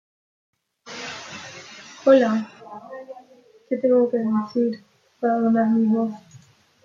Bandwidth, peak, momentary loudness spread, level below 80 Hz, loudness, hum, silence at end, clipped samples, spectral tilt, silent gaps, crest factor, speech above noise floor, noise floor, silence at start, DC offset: 7.4 kHz; -4 dBFS; 22 LU; -74 dBFS; -21 LUFS; none; 0.45 s; under 0.1%; -6.5 dB/octave; none; 20 dB; 34 dB; -53 dBFS; 0.85 s; under 0.1%